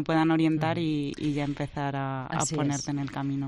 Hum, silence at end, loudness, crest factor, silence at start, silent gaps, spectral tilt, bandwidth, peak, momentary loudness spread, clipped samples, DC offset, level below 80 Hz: none; 0 s; -28 LUFS; 16 dB; 0 s; none; -5.5 dB/octave; 11.5 kHz; -12 dBFS; 8 LU; under 0.1%; under 0.1%; -54 dBFS